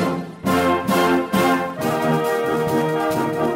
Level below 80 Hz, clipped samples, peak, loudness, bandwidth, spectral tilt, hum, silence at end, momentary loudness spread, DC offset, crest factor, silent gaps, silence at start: -52 dBFS; under 0.1%; -4 dBFS; -20 LUFS; 16.5 kHz; -5.5 dB/octave; none; 0 s; 4 LU; under 0.1%; 14 dB; none; 0 s